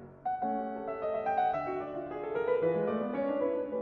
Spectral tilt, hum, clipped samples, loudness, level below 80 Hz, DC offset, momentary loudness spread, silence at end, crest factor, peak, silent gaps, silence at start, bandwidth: -6 dB/octave; none; under 0.1%; -33 LUFS; -66 dBFS; under 0.1%; 8 LU; 0 s; 14 dB; -18 dBFS; none; 0 s; 4.8 kHz